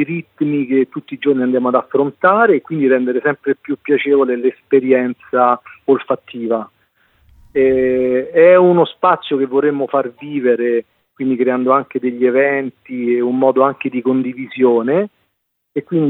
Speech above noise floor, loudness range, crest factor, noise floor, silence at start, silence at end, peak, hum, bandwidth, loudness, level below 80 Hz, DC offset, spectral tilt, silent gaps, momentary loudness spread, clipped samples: 55 dB; 3 LU; 14 dB; -70 dBFS; 0 s; 0 s; 0 dBFS; none; 4.1 kHz; -15 LUFS; -58 dBFS; under 0.1%; -9.5 dB/octave; none; 9 LU; under 0.1%